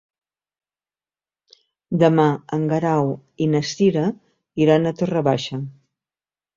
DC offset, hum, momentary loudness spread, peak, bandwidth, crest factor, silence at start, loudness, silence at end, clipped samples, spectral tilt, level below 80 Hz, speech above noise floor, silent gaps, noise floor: under 0.1%; none; 12 LU; -2 dBFS; 7.6 kHz; 20 dB; 1.9 s; -20 LUFS; 0.85 s; under 0.1%; -7 dB/octave; -60 dBFS; over 71 dB; none; under -90 dBFS